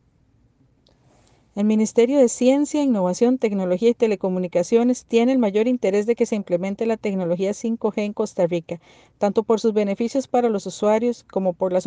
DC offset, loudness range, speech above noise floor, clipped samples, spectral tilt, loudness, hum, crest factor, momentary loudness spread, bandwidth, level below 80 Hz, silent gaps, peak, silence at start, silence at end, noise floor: under 0.1%; 4 LU; 40 dB; under 0.1%; -6 dB/octave; -21 LUFS; none; 16 dB; 6 LU; 9.8 kHz; -64 dBFS; none; -6 dBFS; 1.55 s; 0 s; -60 dBFS